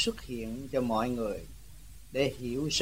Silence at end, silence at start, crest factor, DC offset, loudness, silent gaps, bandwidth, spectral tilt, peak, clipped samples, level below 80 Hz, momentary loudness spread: 0 s; 0 s; 18 dB; 0.3%; -33 LUFS; none; 16 kHz; -4 dB/octave; -14 dBFS; under 0.1%; -50 dBFS; 21 LU